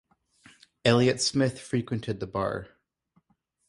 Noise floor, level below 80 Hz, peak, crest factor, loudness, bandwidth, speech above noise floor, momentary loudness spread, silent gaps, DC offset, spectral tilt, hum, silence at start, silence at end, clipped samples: -71 dBFS; -58 dBFS; -8 dBFS; 22 dB; -27 LUFS; 11.5 kHz; 45 dB; 10 LU; none; under 0.1%; -5 dB/octave; none; 0.85 s; 1.05 s; under 0.1%